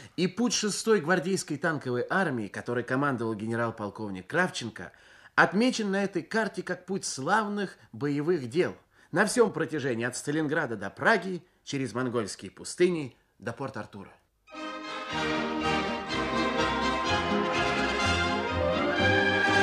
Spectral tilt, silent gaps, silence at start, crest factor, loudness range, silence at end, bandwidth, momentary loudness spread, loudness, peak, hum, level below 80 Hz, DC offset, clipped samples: -4.5 dB/octave; none; 0 s; 20 dB; 5 LU; 0 s; 14 kHz; 13 LU; -28 LUFS; -8 dBFS; none; -54 dBFS; under 0.1%; under 0.1%